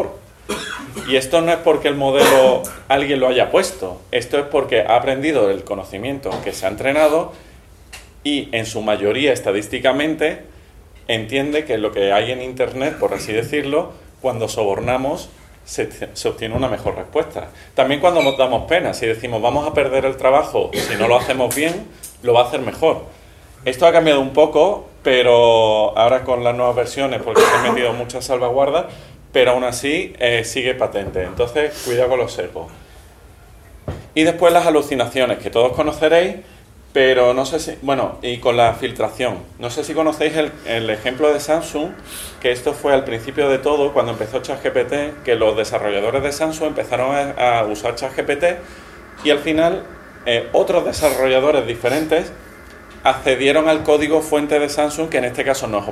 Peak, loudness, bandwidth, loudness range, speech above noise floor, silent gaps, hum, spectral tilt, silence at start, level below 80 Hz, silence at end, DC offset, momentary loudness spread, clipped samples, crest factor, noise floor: 0 dBFS; -17 LUFS; 15.5 kHz; 5 LU; 26 dB; none; none; -4 dB/octave; 0 s; -44 dBFS; 0 s; under 0.1%; 11 LU; under 0.1%; 18 dB; -43 dBFS